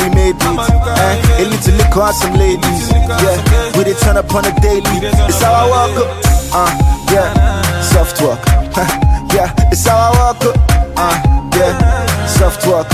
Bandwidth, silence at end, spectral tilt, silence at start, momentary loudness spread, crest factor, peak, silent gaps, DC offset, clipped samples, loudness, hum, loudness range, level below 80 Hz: 16 kHz; 0 s; -5 dB/octave; 0 s; 3 LU; 10 dB; 0 dBFS; none; under 0.1%; under 0.1%; -11 LUFS; none; 1 LU; -14 dBFS